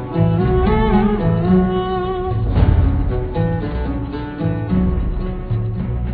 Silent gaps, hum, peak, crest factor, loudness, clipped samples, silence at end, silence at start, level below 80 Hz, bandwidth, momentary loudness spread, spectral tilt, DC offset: none; none; -2 dBFS; 14 dB; -18 LUFS; under 0.1%; 0 s; 0 s; -22 dBFS; 4.8 kHz; 8 LU; -12 dB/octave; under 0.1%